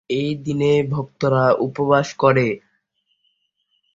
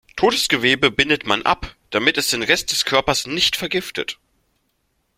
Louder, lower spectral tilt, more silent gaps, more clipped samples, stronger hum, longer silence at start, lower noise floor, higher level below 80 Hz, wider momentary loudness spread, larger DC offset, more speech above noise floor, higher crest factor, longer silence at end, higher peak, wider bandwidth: about the same, -19 LUFS vs -18 LUFS; first, -7 dB/octave vs -2.5 dB/octave; neither; neither; neither; about the same, 0.1 s vs 0.15 s; about the same, -69 dBFS vs -68 dBFS; second, -56 dBFS vs -46 dBFS; about the same, 7 LU vs 9 LU; neither; about the same, 51 dB vs 49 dB; about the same, 18 dB vs 20 dB; first, 1.35 s vs 1.05 s; about the same, -2 dBFS vs 0 dBFS; second, 7.8 kHz vs 16.5 kHz